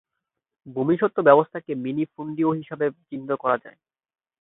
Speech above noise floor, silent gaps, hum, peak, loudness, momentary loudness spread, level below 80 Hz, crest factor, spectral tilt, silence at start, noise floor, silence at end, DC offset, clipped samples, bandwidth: 60 dB; none; none; -2 dBFS; -23 LUFS; 13 LU; -70 dBFS; 22 dB; -11.5 dB/octave; 0.65 s; -83 dBFS; 0.7 s; under 0.1%; under 0.1%; 4 kHz